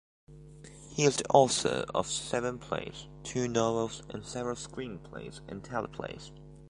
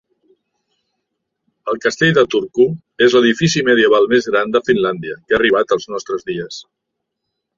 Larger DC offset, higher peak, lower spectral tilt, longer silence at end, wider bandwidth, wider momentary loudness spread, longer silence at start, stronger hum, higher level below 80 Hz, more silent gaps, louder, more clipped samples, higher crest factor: neither; second, -6 dBFS vs -2 dBFS; about the same, -4 dB/octave vs -5 dB/octave; second, 0 s vs 0.95 s; first, 11.5 kHz vs 7.6 kHz; first, 20 LU vs 13 LU; second, 0.3 s vs 1.65 s; neither; about the same, -58 dBFS vs -54 dBFS; neither; second, -31 LUFS vs -15 LUFS; neither; first, 26 dB vs 16 dB